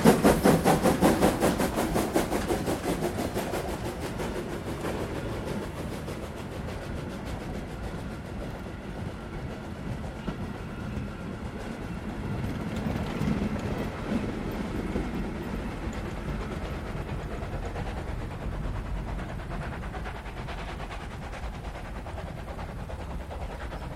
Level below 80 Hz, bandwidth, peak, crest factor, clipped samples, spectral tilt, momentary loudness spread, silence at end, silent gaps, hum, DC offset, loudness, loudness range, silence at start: -40 dBFS; 16 kHz; -4 dBFS; 26 dB; under 0.1%; -6 dB/octave; 14 LU; 0 s; none; none; under 0.1%; -31 LUFS; 9 LU; 0 s